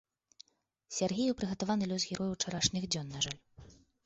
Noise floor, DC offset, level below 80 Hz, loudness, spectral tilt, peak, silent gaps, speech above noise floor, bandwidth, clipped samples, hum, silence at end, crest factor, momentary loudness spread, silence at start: -72 dBFS; under 0.1%; -62 dBFS; -34 LUFS; -3.5 dB/octave; -14 dBFS; none; 38 dB; 8.2 kHz; under 0.1%; none; 0.3 s; 22 dB; 5 LU; 0.9 s